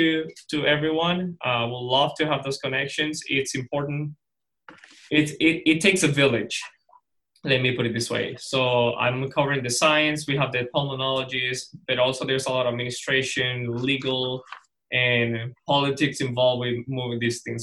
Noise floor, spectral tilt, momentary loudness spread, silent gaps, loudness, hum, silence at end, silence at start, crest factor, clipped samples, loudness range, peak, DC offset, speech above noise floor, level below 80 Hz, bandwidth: -61 dBFS; -4 dB/octave; 9 LU; none; -23 LUFS; none; 0 s; 0 s; 20 dB; under 0.1%; 3 LU; -4 dBFS; under 0.1%; 37 dB; -60 dBFS; 12.5 kHz